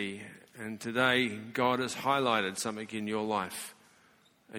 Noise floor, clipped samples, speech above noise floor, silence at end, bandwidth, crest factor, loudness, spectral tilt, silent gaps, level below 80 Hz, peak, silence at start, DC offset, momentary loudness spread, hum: -65 dBFS; under 0.1%; 33 dB; 0 s; 17.5 kHz; 22 dB; -31 LUFS; -3.5 dB/octave; none; -72 dBFS; -12 dBFS; 0 s; under 0.1%; 16 LU; none